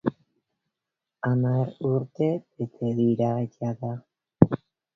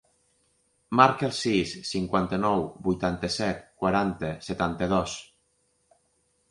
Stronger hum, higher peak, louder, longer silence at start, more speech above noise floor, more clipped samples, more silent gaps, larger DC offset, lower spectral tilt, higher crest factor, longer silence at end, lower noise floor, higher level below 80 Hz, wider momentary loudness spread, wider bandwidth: neither; first, 0 dBFS vs -4 dBFS; about the same, -26 LUFS vs -26 LUFS; second, 0.05 s vs 0.9 s; first, 61 dB vs 45 dB; neither; neither; neither; first, -10.5 dB/octave vs -5.5 dB/octave; about the same, 26 dB vs 24 dB; second, 0.4 s vs 1.25 s; first, -87 dBFS vs -71 dBFS; about the same, -54 dBFS vs -52 dBFS; about the same, 12 LU vs 10 LU; second, 6.2 kHz vs 11.5 kHz